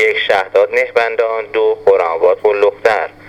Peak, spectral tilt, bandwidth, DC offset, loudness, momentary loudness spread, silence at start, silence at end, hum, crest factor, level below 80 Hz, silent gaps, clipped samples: 0 dBFS; -3.5 dB/octave; 10 kHz; under 0.1%; -13 LUFS; 3 LU; 0 s; 0 s; none; 14 dB; -54 dBFS; none; under 0.1%